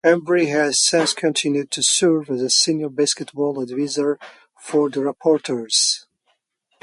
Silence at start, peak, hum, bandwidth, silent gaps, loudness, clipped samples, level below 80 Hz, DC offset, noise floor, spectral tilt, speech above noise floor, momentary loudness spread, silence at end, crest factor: 0.05 s; -4 dBFS; none; 11.5 kHz; none; -19 LUFS; under 0.1%; -72 dBFS; under 0.1%; -68 dBFS; -2.5 dB/octave; 49 dB; 8 LU; 0.85 s; 16 dB